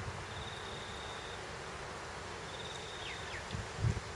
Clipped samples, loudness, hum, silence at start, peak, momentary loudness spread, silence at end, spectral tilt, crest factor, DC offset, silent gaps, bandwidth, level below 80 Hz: under 0.1%; -42 LUFS; none; 0 s; -22 dBFS; 6 LU; 0 s; -4 dB/octave; 20 dB; under 0.1%; none; 11.5 kHz; -54 dBFS